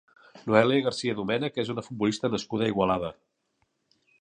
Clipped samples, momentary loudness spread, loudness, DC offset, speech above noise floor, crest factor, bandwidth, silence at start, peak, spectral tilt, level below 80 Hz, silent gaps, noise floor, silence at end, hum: under 0.1%; 10 LU; -27 LUFS; under 0.1%; 48 dB; 24 dB; 10 kHz; 0.35 s; -4 dBFS; -5.5 dB/octave; -60 dBFS; none; -75 dBFS; 1.1 s; none